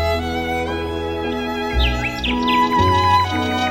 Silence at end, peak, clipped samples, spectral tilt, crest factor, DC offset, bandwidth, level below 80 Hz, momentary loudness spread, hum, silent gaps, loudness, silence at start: 0 s; -4 dBFS; under 0.1%; -5.5 dB/octave; 14 dB; 0.3%; 17 kHz; -28 dBFS; 8 LU; none; none; -19 LUFS; 0 s